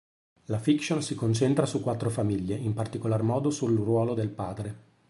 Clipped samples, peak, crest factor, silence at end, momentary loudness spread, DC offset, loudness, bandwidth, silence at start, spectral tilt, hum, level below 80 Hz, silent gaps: under 0.1%; -10 dBFS; 18 dB; 0.3 s; 9 LU; under 0.1%; -28 LUFS; 11.5 kHz; 0.5 s; -6.5 dB/octave; none; -56 dBFS; none